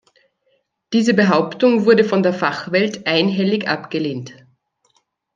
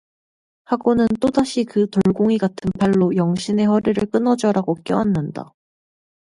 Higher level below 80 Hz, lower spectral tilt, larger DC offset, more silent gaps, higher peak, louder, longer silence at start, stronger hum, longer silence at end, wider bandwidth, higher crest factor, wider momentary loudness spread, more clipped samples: second, -66 dBFS vs -50 dBFS; about the same, -6 dB/octave vs -7 dB/octave; neither; neither; about the same, -2 dBFS vs -4 dBFS; about the same, -17 LUFS vs -19 LUFS; first, 0.9 s vs 0.7 s; neither; first, 1.05 s vs 0.9 s; second, 9 kHz vs 11.5 kHz; about the same, 18 dB vs 16 dB; first, 9 LU vs 5 LU; neither